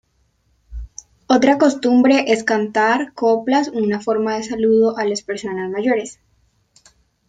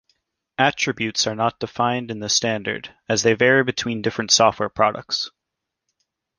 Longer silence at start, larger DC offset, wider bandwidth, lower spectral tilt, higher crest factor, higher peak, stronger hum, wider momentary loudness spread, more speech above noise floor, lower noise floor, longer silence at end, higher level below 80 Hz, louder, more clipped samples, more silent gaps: about the same, 0.7 s vs 0.6 s; neither; second, 9.2 kHz vs 10.5 kHz; first, -4.5 dB/octave vs -3 dB/octave; about the same, 16 dB vs 20 dB; about the same, -2 dBFS vs -2 dBFS; neither; first, 16 LU vs 10 LU; second, 46 dB vs 62 dB; second, -63 dBFS vs -82 dBFS; about the same, 1.15 s vs 1.1 s; first, -46 dBFS vs -58 dBFS; first, -17 LUFS vs -20 LUFS; neither; neither